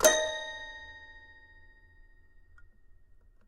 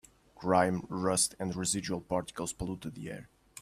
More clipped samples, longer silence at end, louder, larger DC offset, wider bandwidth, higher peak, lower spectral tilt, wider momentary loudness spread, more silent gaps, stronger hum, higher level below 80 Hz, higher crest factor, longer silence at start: neither; first, 2.3 s vs 0 s; about the same, -32 LUFS vs -32 LUFS; neither; about the same, 15.5 kHz vs 15.5 kHz; first, -8 dBFS vs -12 dBFS; second, 0 dB/octave vs -4 dB/octave; first, 26 LU vs 15 LU; neither; neither; about the same, -56 dBFS vs -58 dBFS; about the same, 26 dB vs 22 dB; second, 0 s vs 0.35 s